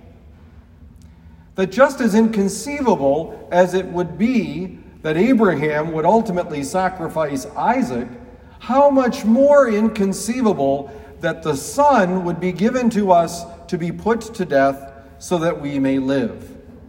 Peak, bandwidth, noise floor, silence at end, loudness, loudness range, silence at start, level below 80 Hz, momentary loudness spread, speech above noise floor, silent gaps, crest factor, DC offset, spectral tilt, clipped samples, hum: 0 dBFS; 16.5 kHz; -44 dBFS; 0 s; -18 LUFS; 3 LU; 0.05 s; -48 dBFS; 11 LU; 27 dB; none; 18 dB; under 0.1%; -6 dB/octave; under 0.1%; none